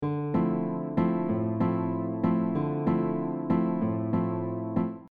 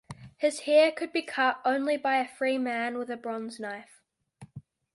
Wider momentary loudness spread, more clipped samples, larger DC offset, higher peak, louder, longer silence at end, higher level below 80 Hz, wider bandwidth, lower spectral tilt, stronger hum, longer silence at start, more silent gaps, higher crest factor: second, 4 LU vs 20 LU; neither; neither; about the same, -12 dBFS vs -10 dBFS; about the same, -28 LUFS vs -28 LUFS; second, 0.05 s vs 0.35 s; first, -60 dBFS vs -72 dBFS; second, 4.5 kHz vs 11.5 kHz; first, -12 dB/octave vs -4 dB/octave; neither; about the same, 0 s vs 0.1 s; neither; about the same, 14 dB vs 18 dB